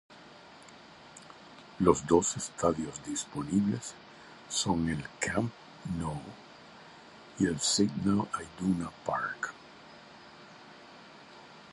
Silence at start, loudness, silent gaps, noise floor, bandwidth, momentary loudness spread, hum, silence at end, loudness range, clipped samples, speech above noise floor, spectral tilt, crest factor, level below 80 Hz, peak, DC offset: 0.1 s; -31 LUFS; none; -53 dBFS; 11.5 kHz; 24 LU; none; 0 s; 4 LU; under 0.1%; 22 dB; -4.5 dB/octave; 26 dB; -56 dBFS; -8 dBFS; under 0.1%